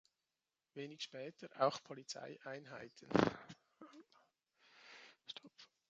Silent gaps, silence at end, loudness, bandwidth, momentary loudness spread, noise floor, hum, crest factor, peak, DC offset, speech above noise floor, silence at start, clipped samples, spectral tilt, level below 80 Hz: none; 0.25 s; -43 LUFS; 8.8 kHz; 24 LU; under -90 dBFS; none; 30 dB; -16 dBFS; under 0.1%; over 48 dB; 0.75 s; under 0.1%; -5 dB/octave; -76 dBFS